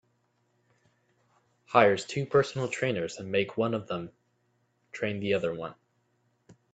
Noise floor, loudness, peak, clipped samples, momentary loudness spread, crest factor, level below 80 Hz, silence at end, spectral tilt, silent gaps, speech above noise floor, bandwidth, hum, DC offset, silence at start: -73 dBFS; -29 LUFS; -4 dBFS; under 0.1%; 15 LU; 26 dB; -68 dBFS; 0.2 s; -5.5 dB/octave; none; 45 dB; 9 kHz; none; under 0.1%; 1.7 s